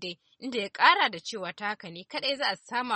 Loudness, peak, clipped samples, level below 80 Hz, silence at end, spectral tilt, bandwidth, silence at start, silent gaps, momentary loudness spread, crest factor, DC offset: -27 LUFS; -4 dBFS; under 0.1%; -80 dBFS; 0 s; -2.5 dB/octave; 8.8 kHz; 0 s; none; 17 LU; 24 dB; under 0.1%